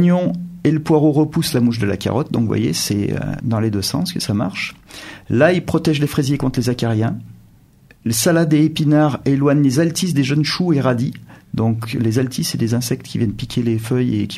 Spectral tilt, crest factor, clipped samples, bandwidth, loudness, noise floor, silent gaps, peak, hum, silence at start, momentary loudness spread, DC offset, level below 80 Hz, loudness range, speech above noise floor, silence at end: -6 dB/octave; 18 dB; under 0.1%; 15 kHz; -18 LUFS; -48 dBFS; none; 0 dBFS; none; 0 s; 8 LU; under 0.1%; -46 dBFS; 4 LU; 32 dB; 0 s